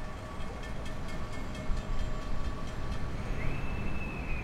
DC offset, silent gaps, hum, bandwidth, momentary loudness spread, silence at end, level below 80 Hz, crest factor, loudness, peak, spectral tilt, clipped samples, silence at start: under 0.1%; none; none; 10.5 kHz; 4 LU; 0 s; -36 dBFS; 16 dB; -39 LUFS; -18 dBFS; -6 dB/octave; under 0.1%; 0 s